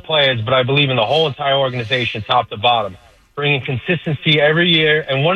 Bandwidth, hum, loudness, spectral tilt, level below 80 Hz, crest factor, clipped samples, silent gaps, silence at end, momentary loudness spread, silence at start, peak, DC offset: 8.4 kHz; none; -15 LUFS; -6.5 dB/octave; -52 dBFS; 14 dB; under 0.1%; none; 0 s; 7 LU; 0.05 s; -2 dBFS; under 0.1%